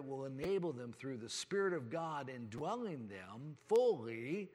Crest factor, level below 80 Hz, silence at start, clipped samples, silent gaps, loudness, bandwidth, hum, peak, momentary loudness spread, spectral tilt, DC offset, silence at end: 16 dB; -78 dBFS; 0 s; under 0.1%; none; -40 LUFS; 13 kHz; none; -24 dBFS; 14 LU; -5 dB/octave; under 0.1%; 0.05 s